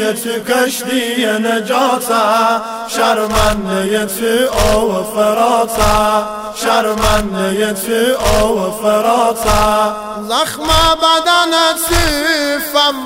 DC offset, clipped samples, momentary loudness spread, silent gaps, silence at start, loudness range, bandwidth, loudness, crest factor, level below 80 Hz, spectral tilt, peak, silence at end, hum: under 0.1%; under 0.1%; 6 LU; none; 0 s; 2 LU; 16.5 kHz; -13 LUFS; 14 dB; -28 dBFS; -3 dB/octave; 0 dBFS; 0 s; none